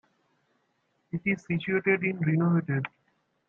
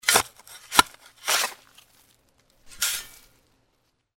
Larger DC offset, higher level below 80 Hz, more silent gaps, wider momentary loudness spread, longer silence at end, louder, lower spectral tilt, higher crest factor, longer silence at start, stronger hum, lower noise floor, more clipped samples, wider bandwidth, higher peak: neither; second, -68 dBFS vs -58 dBFS; neither; second, 7 LU vs 15 LU; second, 0.6 s vs 1.1 s; second, -27 LUFS vs -24 LUFS; first, -9 dB/octave vs 0.5 dB/octave; second, 18 dB vs 28 dB; first, 1.15 s vs 0.05 s; neither; about the same, -74 dBFS vs -71 dBFS; neither; second, 6.8 kHz vs 17 kHz; second, -10 dBFS vs 0 dBFS